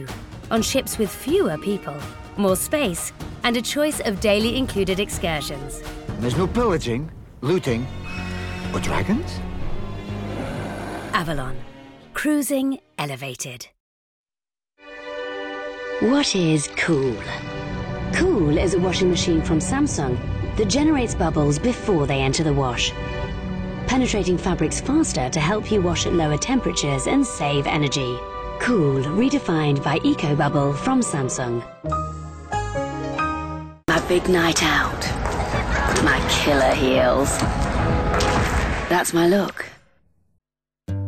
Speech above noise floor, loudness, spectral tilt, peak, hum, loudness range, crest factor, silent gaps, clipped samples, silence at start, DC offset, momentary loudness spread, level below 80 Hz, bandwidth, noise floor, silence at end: over 69 dB; -22 LUFS; -5 dB/octave; -4 dBFS; none; 7 LU; 16 dB; 13.80-14.24 s; under 0.1%; 0 s; under 0.1%; 12 LU; -34 dBFS; 17.5 kHz; under -90 dBFS; 0 s